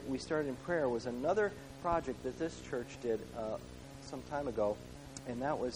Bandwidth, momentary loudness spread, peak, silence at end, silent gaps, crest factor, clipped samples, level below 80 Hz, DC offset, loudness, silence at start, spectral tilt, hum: over 20 kHz; 12 LU; -20 dBFS; 0 s; none; 18 dB; under 0.1%; -58 dBFS; under 0.1%; -38 LUFS; 0 s; -5.5 dB/octave; none